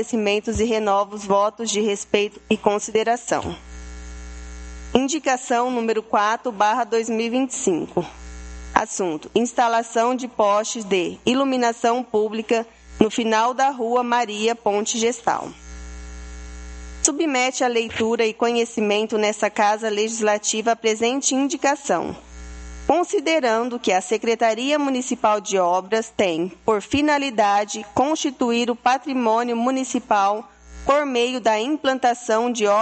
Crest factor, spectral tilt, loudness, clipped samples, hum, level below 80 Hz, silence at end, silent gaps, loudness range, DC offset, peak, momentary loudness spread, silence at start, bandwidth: 22 dB; -3 dB/octave; -21 LUFS; under 0.1%; none; -44 dBFS; 0 s; none; 3 LU; under 0.1%; 0 dBFS; 15 LU; 0 s; 9 kHz